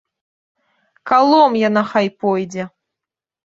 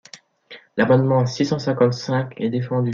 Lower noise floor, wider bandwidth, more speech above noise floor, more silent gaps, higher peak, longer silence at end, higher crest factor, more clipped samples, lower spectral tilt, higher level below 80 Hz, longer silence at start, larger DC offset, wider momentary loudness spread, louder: first, -86 dBFS vs -46 dBFS; about the same, 7.8 kHz vs 7.4 kHz; first, 71 dB vs 27 dB; neither; about the same, -2 dBFS vs -4 dBFS; first, 0.85 s vs 0 s; about the same, 16 dB vs 16 dB; neither; about the same, -6 dB/octave vs -7 dB/octave; about the same, -64 dBFS vs -60 dBFS; first, 1.05 s vs 0.15 s; neither; first, 17 LU vs 8 LU; first, -15 LUFS vs -20 LUFS